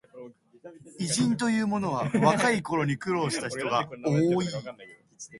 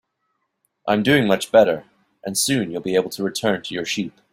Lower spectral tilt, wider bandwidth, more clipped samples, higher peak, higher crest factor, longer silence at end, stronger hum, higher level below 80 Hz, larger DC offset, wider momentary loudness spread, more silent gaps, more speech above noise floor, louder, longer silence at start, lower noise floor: about the same, -5 dB/octave vs -4 dB/octave; second, 11.5 kHz vs 16 kHz; neither; second, -8 dBFS vs -2 dBFS; about the same, 20 dB vs 20 dB; second, 0 s vs 0.25 s; neither; second, -64 dBFS vs -58 dBFS; neither; first, 21 LU vs 10 LU; neither; second, 21 dB vs 53 dB; second, -27 LUFS vs -20 LUFS; second, 0.15 s vs 0.85 s; second, -48 dBFS vs -73 dBFS